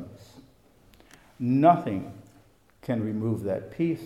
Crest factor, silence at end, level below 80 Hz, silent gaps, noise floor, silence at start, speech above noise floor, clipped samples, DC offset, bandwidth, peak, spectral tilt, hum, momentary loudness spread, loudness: 22 dB; 0 s; -64 dBFS; none; -59 dBFS; 0 s; 34 dB; under 0.1%; under 0.1%; 14 kHz; -6 dBFS; -9 dB/octave; none; 20 LU; -26 LUFS